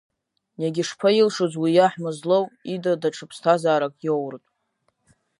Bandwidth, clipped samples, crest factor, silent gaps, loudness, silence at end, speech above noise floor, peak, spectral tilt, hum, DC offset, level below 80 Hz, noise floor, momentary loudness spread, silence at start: 11.5 kHz; under 0.1%; 20 dB; none; -22 LUFS; 1.05 s; 50 dB; -4 dBFS; -5.5 dB/octave; none; under 0.1%; -76 dBFS; -72 dBFS; 10 LU; 0.6 s